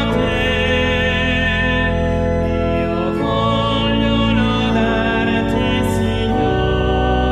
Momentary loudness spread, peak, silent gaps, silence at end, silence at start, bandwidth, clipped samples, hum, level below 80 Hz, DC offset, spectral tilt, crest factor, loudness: 3 LU; -4 dBFS; none; 0 s; 0 s; 13.5 kHz; under 0.1%; none; -26 dBFS; under 0.1%; -6.5 dB/octave; 12 dB; -17 LUFS